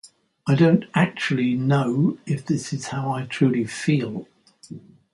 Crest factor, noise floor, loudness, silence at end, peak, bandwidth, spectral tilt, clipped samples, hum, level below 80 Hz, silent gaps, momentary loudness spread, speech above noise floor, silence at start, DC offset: 18 dB; -42 dBFS; -22 LUFS; 0.35 s; -6 dBFS; 11.5 kHz; -6.5 dB/octave; under 0.1%; none; -62 dBFS; none; 16 LU; 21 dB; 0.05 s; under 0.1%